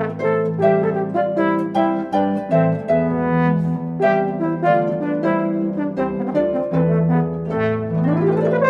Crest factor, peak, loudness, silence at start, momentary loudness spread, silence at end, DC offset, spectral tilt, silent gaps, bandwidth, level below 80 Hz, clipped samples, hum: 16 dB; -4 dBFS; -19 LUFS; 0 s; 4 LU; 0 s; under 0.1%; -10 dB/octave; none; 5 kHz; -50 dBFS; under 0.1%; none